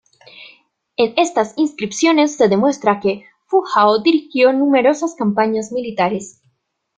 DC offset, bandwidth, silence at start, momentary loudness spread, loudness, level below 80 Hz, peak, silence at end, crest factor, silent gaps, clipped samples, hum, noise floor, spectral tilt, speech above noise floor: under 0.1%; 9.4 kHz; 0.4 s; 8 LU; -16 LUFS; -62 dBFS; 0 dBFS; 0.65 s; 16 dB; none; under 0.1%; none; -65 dBFS; -4.5 dB/octave; 50 dB